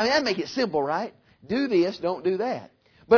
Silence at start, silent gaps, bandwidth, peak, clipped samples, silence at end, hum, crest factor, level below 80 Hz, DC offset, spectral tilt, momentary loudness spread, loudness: 0 s; none; 5.4 kHz; -6 dBFS; under 0.1%; 0 s; none; 18 dB; -62 dBFS; under 0.1%; -5 dB/octave; 8 LU; -26 LUFS